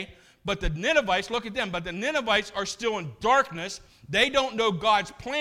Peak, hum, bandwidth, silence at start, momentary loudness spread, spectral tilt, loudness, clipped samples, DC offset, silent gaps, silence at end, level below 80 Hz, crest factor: -8 dBFS; none; 16 kHz; 0 s; 10 LU; -3.5 dB/octave; -26 LUFS; under 0.1%; under 0.1%; none; 0 s; -44 dBFS; 18 dB